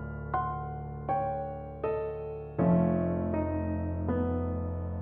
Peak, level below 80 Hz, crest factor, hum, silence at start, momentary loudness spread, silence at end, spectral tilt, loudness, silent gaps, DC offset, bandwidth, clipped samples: -14 dBFS; -46 dBFS; 16 dB; none; 0 s; 11 LU; 0 s; -12.5 dB/octave; -32 LUFS; none; under 0.1%; 3.4 kHz; under 0.1%